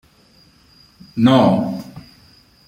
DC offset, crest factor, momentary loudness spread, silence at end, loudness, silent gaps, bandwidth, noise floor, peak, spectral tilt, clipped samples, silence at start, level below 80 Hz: under 0.1%; 18 dB; 18 LU; 0.7 s; -15 LUFS; none; 15.5 kHz; -52 dBFS; -2 dBFS; -7.5 dB/octave; under 0.1%; 1.15 s; -54 dBFS